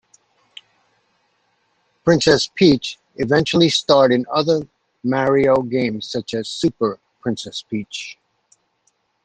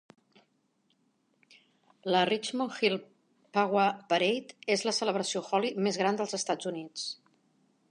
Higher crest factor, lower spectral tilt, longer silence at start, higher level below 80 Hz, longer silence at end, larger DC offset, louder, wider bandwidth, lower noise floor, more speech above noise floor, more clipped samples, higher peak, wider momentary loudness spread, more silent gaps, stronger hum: about the same, 18 dB vs 20 dB; first, -5 dB/octave vs -3.5 dB/octave; about the same, 2.05 s vs 2.05 s; first, -54 dBFS vs -84 dBFS; first, 1.1 s vs 0.75 s; neither; first, -18 LUFS vs -30 LUFS; second, 9.8 kHz vs 11.5 kHz; second, -66 dBFS vs -73 dBFS; first, 49 dB vs 43 dB; neither; first, -2 dBFS vs -12 dBFS; first, 13 LU vs 10 LU; neither; neither